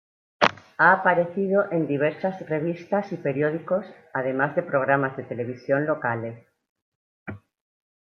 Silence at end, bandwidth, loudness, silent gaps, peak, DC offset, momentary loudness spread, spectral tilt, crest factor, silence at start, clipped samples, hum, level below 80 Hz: 0.65 s; 7 kHz; -24 LUFS; 6.69-6.76 s, 6.82-7.26 s; -2 dBFS; under 0.1%; 12 LU; -7 dB/octave; 24 dB; 0.4 s; under 0.1%; none; -70 dBFS